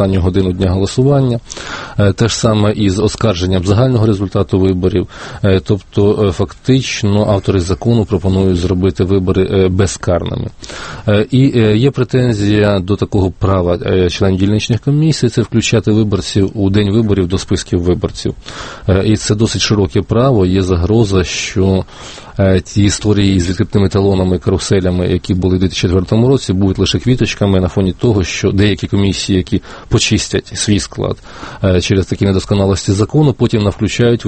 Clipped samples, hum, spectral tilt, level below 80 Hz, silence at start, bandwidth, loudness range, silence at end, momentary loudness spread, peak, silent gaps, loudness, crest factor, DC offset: under 0.1%; none; -6 dB/octave; -32 dBFS; 0 s; 8.8 kHz; 2 LU; 0 s; 5 LU; 0 dBFS; none; -13 LUFS; 12 dB; under 0.1%